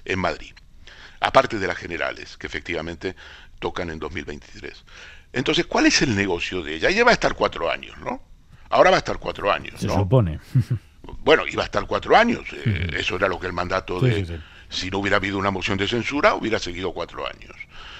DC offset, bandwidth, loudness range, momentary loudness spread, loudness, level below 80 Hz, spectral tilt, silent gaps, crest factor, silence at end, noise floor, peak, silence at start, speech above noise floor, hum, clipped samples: under 0.1%; 12 kHz; 5 LU; 16 LU; -22 LUFS; -42 dBFS; -5 dB/octave; none; 22 dB; 0 s; -44 dBFS; 0 dBFS; 0.05 s; 22 dB; none; under 0.1%